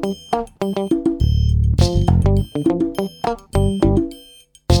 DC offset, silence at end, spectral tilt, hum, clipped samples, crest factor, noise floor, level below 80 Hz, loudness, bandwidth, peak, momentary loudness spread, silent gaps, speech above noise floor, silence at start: under 0.1%; 0 s; -7.5 dB/octave; none; under 0.1%; 18 dB; -46 dBFS; -24 dBFS; -19 LUFS; 17.5 kHz; 0 dBFS; 8 LU; none; 26 dB; 0 s